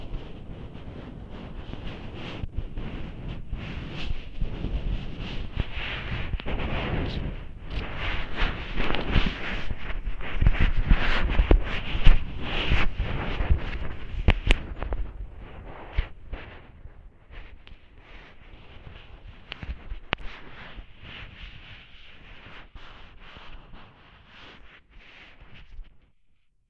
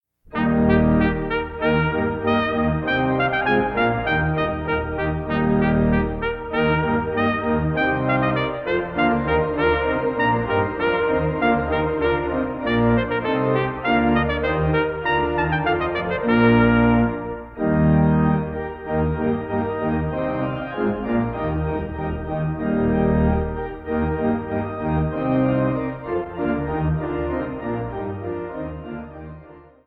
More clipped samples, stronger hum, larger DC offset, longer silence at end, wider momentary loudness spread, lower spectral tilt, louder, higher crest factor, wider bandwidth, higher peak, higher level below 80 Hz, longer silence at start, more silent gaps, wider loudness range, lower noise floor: neither; neither; neither; first, 0.7 s vs 0.25 s; first, 23 LU vs 9 LU; second, -6.5 dB/octave vs -10 dB/octave; second, -31 LUFS vs -21 LUFS; first, 26 dB vs 18 dB; first, 6.2 kHz vs 5 kHz; first, 0 dBFS vs -4 dBFS; about the same, -30 dBFS vs -34 dBFS; second, 0 s vs 0.3 s; neither; first, 20 LU vs 5 LU; first, -60 dBFS vs -44 dBFS